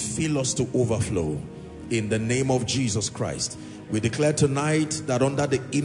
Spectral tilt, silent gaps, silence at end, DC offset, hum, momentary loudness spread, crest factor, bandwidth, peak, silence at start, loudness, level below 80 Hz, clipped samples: -5 dB/octave; none; 0 s; under 0.1%; none; 8 LU; 16 dB; 11 kHz; -8 dBFS; 0 s; -25 LUFS; -52 dBFS; under 0.1%